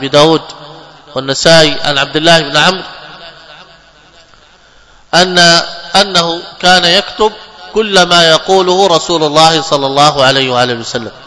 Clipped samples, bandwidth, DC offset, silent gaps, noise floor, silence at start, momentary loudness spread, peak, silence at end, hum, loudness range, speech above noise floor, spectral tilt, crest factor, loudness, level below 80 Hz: 3%; 11 kHz; under 0.1%; none; -42 dBFS; 0 s; 12 LU; 0 dBFS; 0.15 s; none; 5 LU; 33 dB; -3 dB/octave; 10 dB; -8 LUFS; -42 dBFS